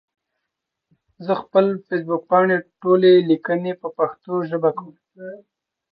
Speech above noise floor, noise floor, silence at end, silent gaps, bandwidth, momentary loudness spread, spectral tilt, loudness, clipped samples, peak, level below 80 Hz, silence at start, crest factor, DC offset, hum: 62 dB; -81 dBFS; 0.55 s; none; 5 kHz; 20 LU; -10.5 dB/octave; -19 LUFS; under 0.1%; -4 dBFS; -74 dBFS; 1.2 s; 18 dB; under 0.1%; none